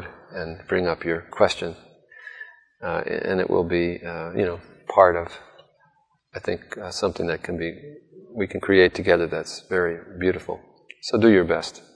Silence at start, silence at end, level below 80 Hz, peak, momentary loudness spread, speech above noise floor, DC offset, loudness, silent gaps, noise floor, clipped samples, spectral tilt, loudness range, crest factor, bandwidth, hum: 0 s; 0.15 s; -54 dBFS; 0 dBFS; 19 LU; 41 dB; under 0.1%; -23 LUFS; none; -64 dBFS; under 0.1%; -5.5 dB/octave; 5 LU; 24 dB; 10.5 kHz; none